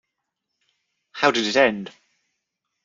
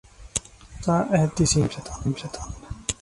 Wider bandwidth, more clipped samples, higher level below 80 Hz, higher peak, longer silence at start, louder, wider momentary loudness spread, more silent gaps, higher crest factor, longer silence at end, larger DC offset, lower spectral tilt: second, 7.6 kHz vs 11.5 kHz; neither; second, -68 dBFS vs -42 dBFS; first, -2 dBFS vs -8 dBFS; first, 1.15 s vs 0.2 s; first, -20 LUFS vs -25 LUFS; first, 21 LU vs 13 LU; neither; first, 24 dB vs 18 dB; first, 0.95 s vs 0.1 s; neither; second, -3.5 dB/octave vs -5 dB/octave